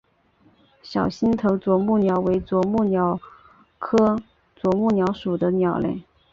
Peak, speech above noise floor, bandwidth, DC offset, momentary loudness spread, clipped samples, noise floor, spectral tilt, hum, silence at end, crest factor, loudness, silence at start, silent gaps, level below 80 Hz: -6 dBFS; 39 dB; 7.4 kHz; under 0.1%; 9 LU; under 0.1%; -59 dBFS; -8.5 dB/octave; none; 0.3 s; 16 dB; -22 LUFS; 0.85 s; none; -50 dBFS